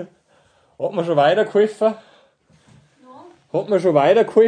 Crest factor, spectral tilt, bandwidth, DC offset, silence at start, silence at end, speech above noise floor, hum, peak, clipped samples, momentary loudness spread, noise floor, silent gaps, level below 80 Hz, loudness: 18 dB; -6.5 dB/octave; 9.8 kHz; under 0.1%; 0 s; 0 s; 41 dB; none; -2 dBFS; under 0.1%; 13 LU; -58 dBFS; none; -70 dBFS; -18 LUFS